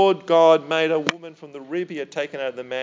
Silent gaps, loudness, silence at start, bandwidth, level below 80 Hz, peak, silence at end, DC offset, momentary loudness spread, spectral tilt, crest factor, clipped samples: none; -21 LUFS; 0 s; 7.6 kHz; -68 dBFS; 0 dBFS; 0 s; under 0.1%; 20 LU; -4.5 dB/octave; 20 dB; under 0.1%